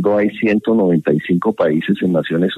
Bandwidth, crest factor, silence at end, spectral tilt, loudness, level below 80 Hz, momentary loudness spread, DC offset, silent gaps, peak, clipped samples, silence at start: 6.2 kHz; 12 dB; 0 s; -8.5 dB/octave; -16 LUFS; -56 dBFS; 2 LU; under 0.1%; none; -2 dBFS; under 0.1%; 0 s